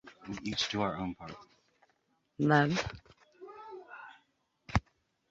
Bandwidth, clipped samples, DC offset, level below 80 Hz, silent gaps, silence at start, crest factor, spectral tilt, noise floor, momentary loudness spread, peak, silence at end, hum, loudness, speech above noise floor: 8 kHz; under 0.1%; under 0.1%; -52 dBFS; none; 0.05 s; 26 dB; -5.5 dB/octave; -75 dBFS; 25 LU; -10 dBFS; 0.5 s; none; -32 LUFS; 44 dB